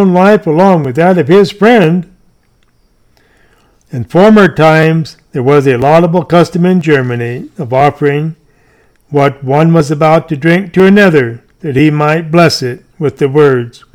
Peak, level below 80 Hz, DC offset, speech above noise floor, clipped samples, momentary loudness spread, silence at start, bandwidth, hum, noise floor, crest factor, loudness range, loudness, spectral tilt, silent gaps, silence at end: 0 dBFS; -44 dBFS; under 0.1%; 43 dB; 1%; 11 LU; 0 s; 14 kHz; none; -51 dBFS; 8 dB; 4 LU; -9 LUFS; -7 dB/octave; none; 0.25 s